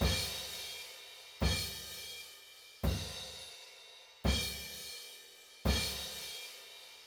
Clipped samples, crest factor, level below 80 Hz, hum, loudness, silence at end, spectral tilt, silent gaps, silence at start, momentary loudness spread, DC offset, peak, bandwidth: under 0.1%; 22 dB; -44 dBFS; none; -38 LUFS; 0 s; -3.5 dB/octave; none; 0 s; 17 LU; under 0.1%; -16 dBFS; over 20 kHz